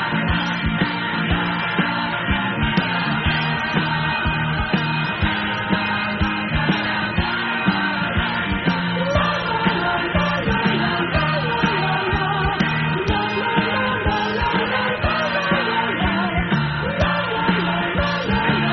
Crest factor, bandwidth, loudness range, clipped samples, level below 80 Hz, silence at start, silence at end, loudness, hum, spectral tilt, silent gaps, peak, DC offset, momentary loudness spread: 16 dB; 6.2 kHz; 1 LU; under 0.1%; -34 dBFS; 0 s; 0 s; -20 LUFS; none; -3.5 dB/octave; none; -4 dBFS; under 0.1%; 2 LU